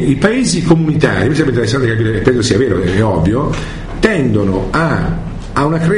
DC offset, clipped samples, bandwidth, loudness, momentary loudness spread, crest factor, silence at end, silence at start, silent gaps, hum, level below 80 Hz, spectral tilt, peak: under 0.1%; under 0.1%; 11 kHz; -13 LUFS; 6 LU; 12 dB; 0 s; 0 s; none; none; -28 dBFS; -6 dB/octave; 0 dBFS